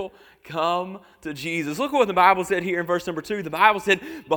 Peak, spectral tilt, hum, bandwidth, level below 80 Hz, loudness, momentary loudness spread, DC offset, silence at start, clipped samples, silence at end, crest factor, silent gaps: -2 dBFS; -4.5 dB/octave; none; 19.5 kHz; -60 dBFS; -22 LUFS; 16 LU; under 0.1%; 0 s; under 0.1%; 0 s; 22 dB; none